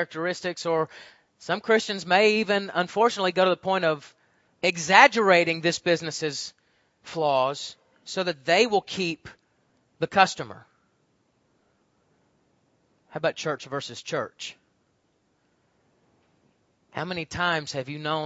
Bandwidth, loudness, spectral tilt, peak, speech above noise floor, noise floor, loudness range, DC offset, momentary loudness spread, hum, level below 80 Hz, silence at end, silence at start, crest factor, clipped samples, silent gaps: 8 kHz; -24 LUFS; -3.5 dB/octave; 0 dBFS; 45 dB; -70 dBFS; 14 LU; under 0.1%; 16 LU; none; -68 dBFS; 0 s; 0 s; 26 dB; under 0.1%; none